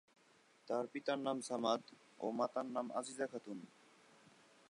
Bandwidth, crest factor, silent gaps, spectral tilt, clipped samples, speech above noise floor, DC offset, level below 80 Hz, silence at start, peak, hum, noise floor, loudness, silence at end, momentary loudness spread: 11 kHz; 20 dB; none; -4 dB/octave; under 0.1%; 29 dB; under 0.1%; under -90 dBFS; 0.65 s; -22 dBFS; none; -70 dBFS; -42 LUFS; 1.05 s; 13 LU